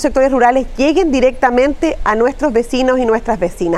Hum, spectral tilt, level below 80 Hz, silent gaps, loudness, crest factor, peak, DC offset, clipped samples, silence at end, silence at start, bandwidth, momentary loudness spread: none; -5 dB/octave; -30 dBFS; none; -14 LUFS; 14 dB; 0 dBFS; under 0.1%; under 0.1%; 0 s; 0 s; 12.5 kHz; 4 LU